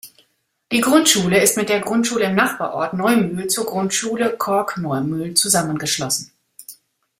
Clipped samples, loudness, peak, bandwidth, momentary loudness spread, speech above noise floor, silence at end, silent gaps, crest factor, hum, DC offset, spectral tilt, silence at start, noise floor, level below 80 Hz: under 0.1%; -18 LUFS; 0 dBFS; 16 kHz; 9 LU; 46 dB; 0.45 s; none; 18 dB; none; under 0.1%; -3 dB/octave; 0.05 s; -65 dBFS; -58 dBFS